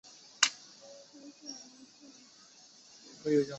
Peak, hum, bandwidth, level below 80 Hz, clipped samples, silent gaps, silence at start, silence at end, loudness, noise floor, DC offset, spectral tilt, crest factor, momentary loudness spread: -4 dBFS; none; 8.2 kHz; -80 dBFS; under 0.1%; none; 0.4 s; 0 s; -32 LUFS; -58 dBFS; under 0.1%; -2 dB/octave; 34 dB; 26 LU